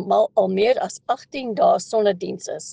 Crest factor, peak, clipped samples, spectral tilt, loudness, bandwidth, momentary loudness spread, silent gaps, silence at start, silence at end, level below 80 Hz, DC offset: 14 dB; -6 dBFS; under 0.1%; -4.5 dB/octave; -21 LUFS; 9.6 kHz; 10 LU; none; 0 s; 0 s; -66 dBFS; under 0.1%